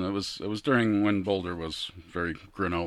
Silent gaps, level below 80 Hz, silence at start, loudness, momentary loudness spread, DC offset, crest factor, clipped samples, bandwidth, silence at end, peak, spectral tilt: none; -54 dBFS; 0 s; -29 LUFS; 10 LU; under 0.1%; 18 dB; under 0.1%; 12.5 kHz; 0 s; -10 dBFS; -6 dB/octave